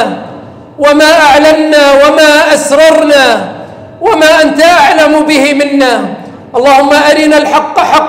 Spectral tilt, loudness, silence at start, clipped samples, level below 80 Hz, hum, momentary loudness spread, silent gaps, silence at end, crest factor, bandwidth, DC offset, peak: -3 dB/octave; -5 LUFS; 0 s; 0.3%; -42 dBFS; none; 11 LU; none; 0 s; 6 dB; 16.5 kHz; under 0.1%; 0 dBFS